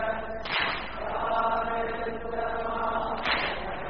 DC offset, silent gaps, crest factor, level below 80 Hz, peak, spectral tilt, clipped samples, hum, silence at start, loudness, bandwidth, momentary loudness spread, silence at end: 0.9%; none; 18 dB; -48 dBFS; -12 dBFS; -1 dB/octave; under 0.1%; none; 0 s; -29 LUFS; 5.4 kHz; 6 LU; 0 s